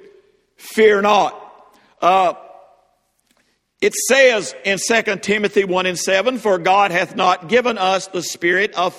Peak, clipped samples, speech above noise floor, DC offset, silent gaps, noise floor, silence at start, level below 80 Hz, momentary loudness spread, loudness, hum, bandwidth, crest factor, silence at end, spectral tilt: 0 dBFS; under 0.1%; 47 dB; under 0.1%; none; -63 dBFS; 0.65 s; -62 dBFS; 8 LU; -16 LUFS; none; 16 kHz; 18 dB; 0 s; -3 dB/octave